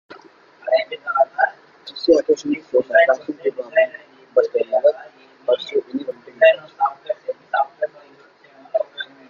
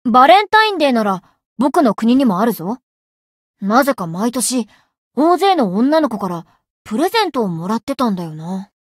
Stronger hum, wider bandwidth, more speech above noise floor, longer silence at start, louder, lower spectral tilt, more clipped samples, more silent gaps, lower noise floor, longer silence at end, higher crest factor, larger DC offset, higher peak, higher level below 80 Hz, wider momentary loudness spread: neither; second, 7.2 kHz vs 16 kHz; second, 32 dB vs over 75 dB; first, 0.65 s vs 0.05 s; second, -20 LUFS vs -15 LUFS; about the same, -3.5 dB/octave vs -4.5 dB/octave; neither; second, none vs 1.46-1.56 s, 2.83-3.54 s, 4.98-5.11 s, 6.70-6.85 s, 7.83-7.87 s; second, -50 dBFS vs under -90 dBFS; about the same, 0.25 s vs 0.2 s; about the same, 18 dB vs 16 dB; neither; about the same, -2 dBFS vs 0 dBFS; second, -68 dBFS vs -60 dBFS; about the same, 13 LU vs 14 LU